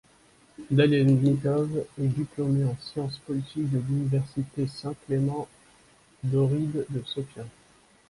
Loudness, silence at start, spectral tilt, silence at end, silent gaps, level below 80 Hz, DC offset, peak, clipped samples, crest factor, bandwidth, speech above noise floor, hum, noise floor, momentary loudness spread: -27 LUFS; 0.6 s; -8 dB/octave; 0.6 s; none; -58 dBFS; under 0.1%; -8 dBFS; under 0.1%; 18 dB; 11.5 kHz; 33 dB; none; -59 dBFS; 14 LU